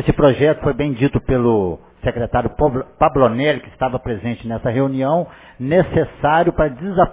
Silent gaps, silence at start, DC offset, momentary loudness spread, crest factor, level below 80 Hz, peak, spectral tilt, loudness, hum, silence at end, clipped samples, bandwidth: none; 0 s; under 0.1%; 9 LU; 16 dB; -34 dBFS; 0 dBFS; -11.5 dB/octave; -18 LUFS; none; 0 s; under 0.1%; 4 kHz